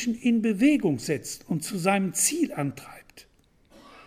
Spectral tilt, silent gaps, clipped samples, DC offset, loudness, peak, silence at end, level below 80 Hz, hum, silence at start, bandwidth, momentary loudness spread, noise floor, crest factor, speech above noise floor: -4.5 dB/octave; none; under 0.1%; under 0.1%; -25 LUFS; -8 dBFS; 0.05 s; -60 dBFS; none; 0 s; 16.5 kHz; 11 LU; -58 dBFS; 18 dB; 33 dB